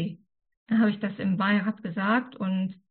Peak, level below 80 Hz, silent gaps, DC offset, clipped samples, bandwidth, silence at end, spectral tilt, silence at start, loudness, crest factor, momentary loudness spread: -14 dBFS; -70 dBFS; 0.57-0.66 s; under 0.1%; under 0.1%; 4.4 kHz; 0.2 s; -5.5 dB/octave; 0 s; -27 LUFS; 14 dB; 6 LU